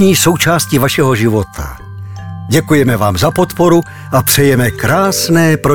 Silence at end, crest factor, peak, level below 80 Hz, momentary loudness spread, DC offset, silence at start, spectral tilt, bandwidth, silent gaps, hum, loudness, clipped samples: 0 s; 12 dB; 0 dBFS; -36 dBFS; 17 LU; 1%; 0 s; -5 dB/octave; 20 kHz; none; none; -11 LUFS; under 0.1%